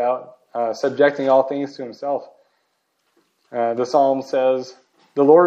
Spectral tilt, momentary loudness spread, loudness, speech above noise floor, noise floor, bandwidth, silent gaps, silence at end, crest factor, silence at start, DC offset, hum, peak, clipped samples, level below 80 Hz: -6 dB/octave; 12 LU; -20 LUFS; 51 dB; -69 dBFS; 7.8 kHz; none; 0 s; 18 dB; 0 s; under 0.1%; none; -2 dBFS; under 0.1%; -80 dBFS